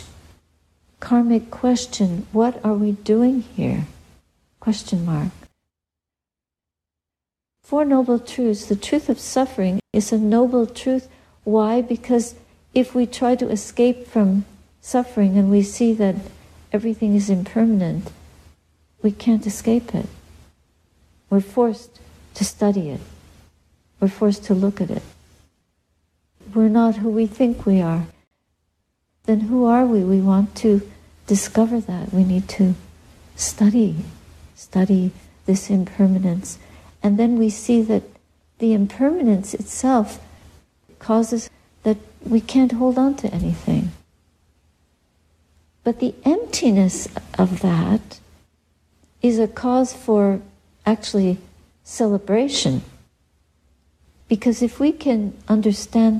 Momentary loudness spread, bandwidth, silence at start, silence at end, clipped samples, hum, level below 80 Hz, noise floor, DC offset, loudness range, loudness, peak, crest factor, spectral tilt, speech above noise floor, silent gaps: 10 LU; 13.5 kHz; 0 s; 0 s; under 0.1%; none; -48 dBFS; -88 dBFS; under 0.1%; 5 LU; -20 LUFS; -4 dBFS; 16 dB; -6.5 dB/octave; 69 dB; 28.27-28.31 s